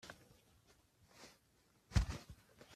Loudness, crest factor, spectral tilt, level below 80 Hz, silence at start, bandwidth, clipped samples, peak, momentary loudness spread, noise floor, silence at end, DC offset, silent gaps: -42 LUFS; 28 dB; -5.5 dB/octave; -50 dBFS; 0.05 s; 14.5 kHz; under 0.1%; -18 dBFS; 22 LU; -74 dBFS; 0 s; under 0.1%; none